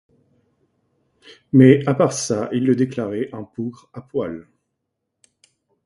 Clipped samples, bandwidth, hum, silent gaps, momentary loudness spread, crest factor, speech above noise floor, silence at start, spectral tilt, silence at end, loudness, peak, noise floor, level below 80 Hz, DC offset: under 0.1%; 11.5 kHz; none; none; 18 LU; 20 dB; 59 dB; 1.55 s; -6.5 dB/octave; 1.45 s; -19 LUFS; 0 dBFS; -78 dBFS; -60 dBFS; under 0.1%